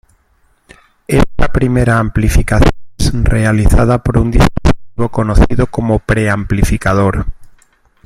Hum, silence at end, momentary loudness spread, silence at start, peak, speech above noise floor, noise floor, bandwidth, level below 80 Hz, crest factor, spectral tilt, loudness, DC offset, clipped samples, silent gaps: none; 0.55 s; 5 LU; 1.1 s; 0 dBFS; 44 dB; -54 dBFS; 15 kHz; -18 dBFS; 12 dB; -6.5 dB/octave; -13 LUFS; under 0.1%; under 0.1%; none